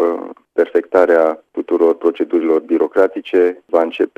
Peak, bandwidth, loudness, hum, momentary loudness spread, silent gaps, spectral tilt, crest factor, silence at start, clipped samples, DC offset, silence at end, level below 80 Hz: 0 dBFS; 6.6 kHz; -16 LUFS; none; 7 LU; none; -6 dB/octave; 14 dB; 0 s; under 0.1%; under 0.1%; 0.1 s; -58 dBFS